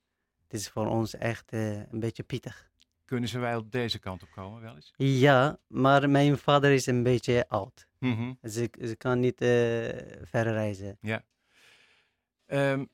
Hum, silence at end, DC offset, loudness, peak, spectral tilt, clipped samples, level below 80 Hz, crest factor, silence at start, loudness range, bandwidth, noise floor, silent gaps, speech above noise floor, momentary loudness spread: none; 0.1 s; under 0.1%; -28 LUFS; -8 dBFS; -6 dB/octave; under 0.1%; -62 dBFS; 22 dB; 0.55 s; 10 LU; 15.5 kHz; -78 dBFS; none; 51 dB; 16 LU